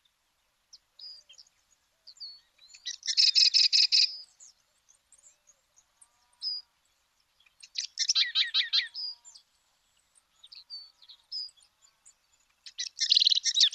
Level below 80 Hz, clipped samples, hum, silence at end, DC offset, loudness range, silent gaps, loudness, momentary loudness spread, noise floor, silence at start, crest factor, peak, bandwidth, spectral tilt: -84 dBFS; under 0.1%; none; 0.05 s; under 0.1%; 19 LU; none; -24 LUFS; 25 LU; -74 dBFS; 1 s; 22 dB; -10 dBFS; 13 kHz; 7.5 dB/octave